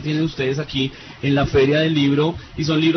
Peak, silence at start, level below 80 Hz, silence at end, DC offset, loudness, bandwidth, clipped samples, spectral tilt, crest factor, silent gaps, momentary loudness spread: -6 dBFS; 0 s; -40 dBFS; 0 s; under 0.1%; -19 LUFS; 6.4 kHz; under 0.1%; -6.5 dB/octave; 14 dB; none; 8 LU